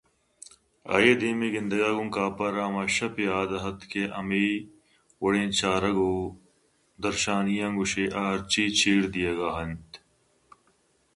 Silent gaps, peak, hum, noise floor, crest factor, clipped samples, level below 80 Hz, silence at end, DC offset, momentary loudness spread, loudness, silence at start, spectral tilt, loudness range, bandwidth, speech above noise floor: none; -6 dBFS; none; -67 dBFS; 22 dB; under 0.1%; -54 dBFS; 1.2 s; under 0.1%; 11 LU; -26 LUFS; 0.85 s; -4 dB/octave; 2 LU; 11.5 kHz; 41 dB